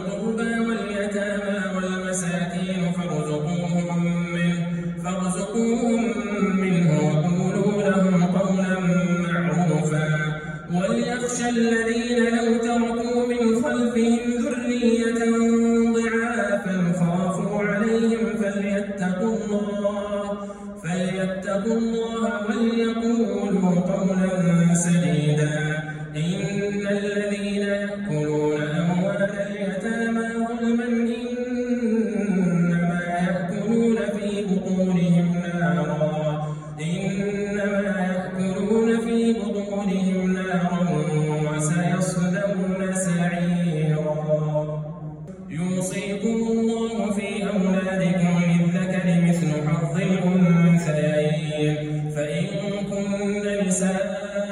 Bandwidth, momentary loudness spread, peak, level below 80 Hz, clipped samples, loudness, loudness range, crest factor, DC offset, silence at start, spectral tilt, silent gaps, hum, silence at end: 11.5 kHz; 6 LU; -8 dBFS; -52 dBFS; under 0.1%; -23 LUFS; 4 LU; 14 dB; under 0.1%; 0 s; -6.5 dB/octave; none; none; 0 s